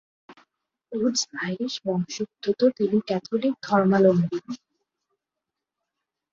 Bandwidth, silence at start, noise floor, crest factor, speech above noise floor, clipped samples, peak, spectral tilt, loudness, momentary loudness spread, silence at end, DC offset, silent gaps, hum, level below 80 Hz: 7.8 kHz; 0.3 s; -86 dBFS; 20 dB; 63 dB; under 0.1%; -6 dBFS; -5.5 dB/octave; -24 LUFS; 12 LU; 1.75 s; under 0.1%; none; none; -68 dBFS